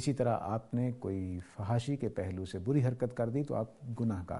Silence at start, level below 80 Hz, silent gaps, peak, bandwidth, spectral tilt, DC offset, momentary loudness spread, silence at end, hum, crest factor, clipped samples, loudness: 0 s; -60 dBFS; none; -18 dBFS; 11.5 kHz; -8 dB/octave; under 0.1%; 7 LU; 0 s; none; 16 dB; under 0.1%; -35 LUFS